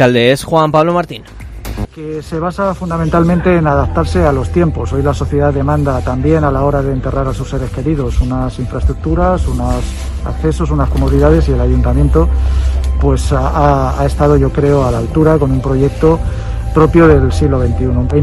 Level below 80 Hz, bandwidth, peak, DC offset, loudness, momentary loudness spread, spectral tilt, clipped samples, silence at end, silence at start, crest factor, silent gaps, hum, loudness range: -18 dBFS; 12 kHz; 0 dBFS; under 0.1%; -13 LUFS; 9 LU; -7.5 dB/octave; 0.2%; 0 s; 0 s; 12 dB; none; none; 4 LU